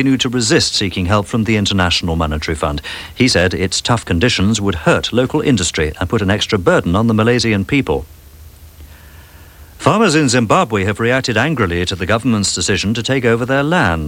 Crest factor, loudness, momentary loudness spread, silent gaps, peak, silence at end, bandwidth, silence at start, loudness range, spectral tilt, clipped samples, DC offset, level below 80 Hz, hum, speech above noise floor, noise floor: 14 dB; -15 LUFS; 6 LU; none; 0 dBFS; 0 s; 17 kHz; 0 s; 3 LU; -4.5 dB/octave; under 0.1%; under 0.1%; -34 dBFS; none; 24 dB; -39 dBFS